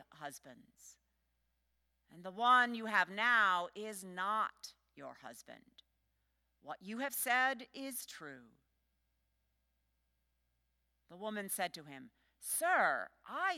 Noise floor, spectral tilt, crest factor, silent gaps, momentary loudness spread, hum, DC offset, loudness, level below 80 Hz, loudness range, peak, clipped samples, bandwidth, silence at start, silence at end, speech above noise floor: -82 dBFS; -1.5 dB/octave; 22 dB; none; 23 LU; none; under 0.1%; -35 LUFS; -84 dBFS; 13 LU; -18 dBFS; under 0.1%; 17 kHz; 0.2 s; 0 s; 45 dB